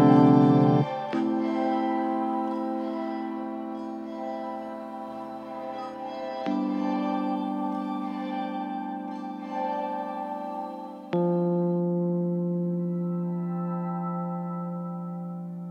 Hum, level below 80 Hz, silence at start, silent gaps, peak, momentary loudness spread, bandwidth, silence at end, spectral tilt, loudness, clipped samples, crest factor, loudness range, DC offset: none; -78 dBFS; 0 s; none; -6 dBFS; 11 LU; 6.6 kHz; 0 s; -9.5 dB/octave; -28 LUFS; under 0.1%; 20 dB; 6 LU; under 0.1%